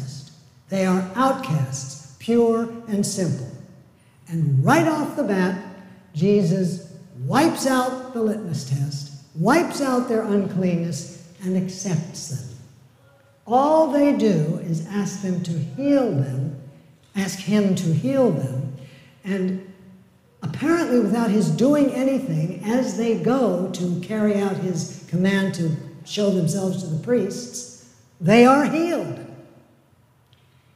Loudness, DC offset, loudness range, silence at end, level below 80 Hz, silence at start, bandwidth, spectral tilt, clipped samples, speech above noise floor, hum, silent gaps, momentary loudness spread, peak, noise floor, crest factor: -22 LUFS; under 0.1%; 3 LU; 1.35 s; -64 dBFS; 0 s; 15.5 kHz; -6.5 dB/octave; under 0.1%; 37 dB; none; none; 15 LU; -4 dBFS; -58 dBFS; 18 dB